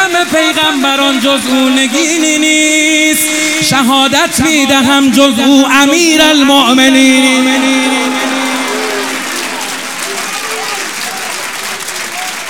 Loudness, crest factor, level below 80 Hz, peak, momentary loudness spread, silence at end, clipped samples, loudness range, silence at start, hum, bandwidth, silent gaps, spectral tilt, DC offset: -9 LUFS; 10 dB; -48 dBFS; 0 dBFS; 11 LU; 0 s; 0.4%; 9 LU; 0 s; none; 18 kHz; none; -2 dB/octave; 0.6%